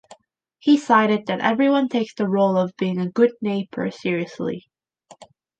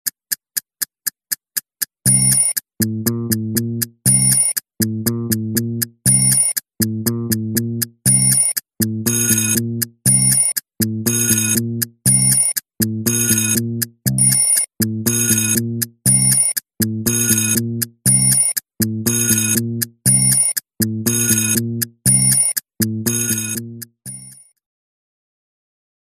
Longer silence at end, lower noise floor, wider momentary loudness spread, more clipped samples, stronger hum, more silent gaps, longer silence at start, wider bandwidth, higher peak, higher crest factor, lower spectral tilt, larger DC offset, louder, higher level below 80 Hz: second, 0.35 s vs 1.7 s; first, -58 dBFS vs -41 dBFS; about the same, 10 LU vs 11 LU; neither; neither; neither; about the same, 0.1 s vs 0.05 s; second, 9 kHz vs 15 kHz; about the same, -2 dBFS vs 0 dBFS; about the same, 18 dB vs 18 dB; first, -6.5 dB/octave vs -3 dB/octave; neither; second, -21 LUFS vs -15 LUFS; second, -70 dBFS vs -48 dBFS